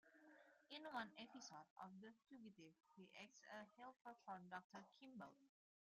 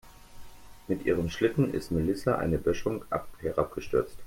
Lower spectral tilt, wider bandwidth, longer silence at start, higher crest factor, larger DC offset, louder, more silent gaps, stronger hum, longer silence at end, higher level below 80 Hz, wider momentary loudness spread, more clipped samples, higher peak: second, -3.5 dB/octave vs -7 dB/octave; second, 11.5 kHz vs 16.5 kHz; about the same, 0.05 s vs 0.05 s; about the same, 22 dB vs 20 dB; neither; second, -60 LUFS vs -30 LUFS; first, 1.70-1.76 s, 4.64-4.70 s vs none; neither; first, 0.4 s vs 0 s; second, under -90 dBFS vs -48 dBFS; first, 11 LU vs 6 LU; neither; second, -38 dBFS vs -10 dBFS